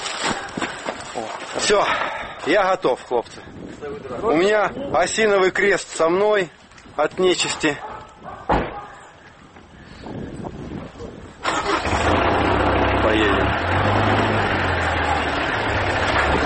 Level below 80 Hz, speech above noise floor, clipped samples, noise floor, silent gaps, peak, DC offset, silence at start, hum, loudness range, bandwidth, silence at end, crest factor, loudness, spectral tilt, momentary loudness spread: -36 dBFS; 26 dB; under 0.1%; -45 dBFS; none; -6 dBFS; under 0.1%; 0 s; none; 9 LU; 8.8 kHz; 0 s; 16 dB; -20 LUFS; -4.5 dB/octave; 16 LU